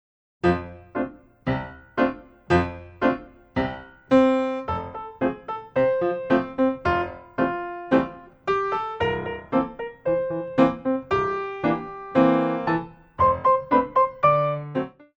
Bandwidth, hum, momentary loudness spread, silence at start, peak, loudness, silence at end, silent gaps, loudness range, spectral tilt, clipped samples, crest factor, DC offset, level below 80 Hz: 8 kHz; none; 12 LU; 0.45 s; -6 dBFS; -24 LUFS; 0.3 s; none; 4 LU; -8 dB/octave; under 0.1%; 18 dB; under 0.1%; -48 dBFS